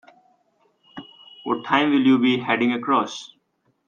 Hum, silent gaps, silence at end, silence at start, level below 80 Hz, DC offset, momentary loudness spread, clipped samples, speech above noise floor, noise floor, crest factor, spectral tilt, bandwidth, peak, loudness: none; none; 0.6 s; 0.95 s; -70 dBFS; under 0.1%; 24 LU; under 0.1%; 48 dB; -68 dBFS; 20 dB; -5 dB/octave; 7.2 kHz; -4 dBFS; -20 LUFS